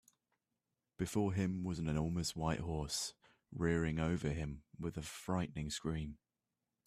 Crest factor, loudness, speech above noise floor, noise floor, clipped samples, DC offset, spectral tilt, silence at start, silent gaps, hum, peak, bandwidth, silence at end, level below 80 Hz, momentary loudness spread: 18 dB; -40 LUFS; over 51 dB; under -90 dBFS; under 0.1%; under 0.1%; -5.5 dB/octave; 1 s; none; none; -22 dBFS; 15 kHz; 0.7 s; -56 dBFS; 10 LU